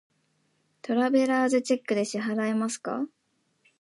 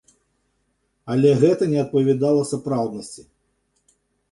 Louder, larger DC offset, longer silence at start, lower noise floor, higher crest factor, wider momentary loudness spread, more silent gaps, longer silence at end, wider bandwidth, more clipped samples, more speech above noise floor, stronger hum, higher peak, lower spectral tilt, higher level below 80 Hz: second, -26 LUFS vs -20 LUFS; neither; second, 0.85 s vs 1.05 s; about the same, -71 dBFS vs -70 dBFS; about the same, 16 dB vs 18 dB; second, 10 LU vs 21 LU; neither; second, 0.75 s vs 1.1 s; about the same, 11.5 kHz vs 11.5 kHz; neither; second, 45 dB vs 51 dB; second, none vs 50 Hz at -50 dBFS; second, -12 dBFS vs -4 dBFS; second, -4.5 dB/octave vs -7.5 dB/octave; second, -80 dBFS vs -62 dBFS